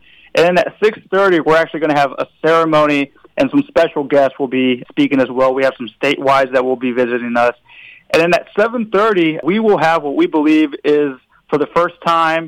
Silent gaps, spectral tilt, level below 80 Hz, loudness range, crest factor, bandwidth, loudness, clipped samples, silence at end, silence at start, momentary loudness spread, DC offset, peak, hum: none; -6 dB/octave; -52 dBFS; 2 LU; 10 dB; 13.5 kHz; -14 LUFS; under 0.1%; 0 s; 0.35 s; 5 LU; under 0.1%; -4 dBFS; none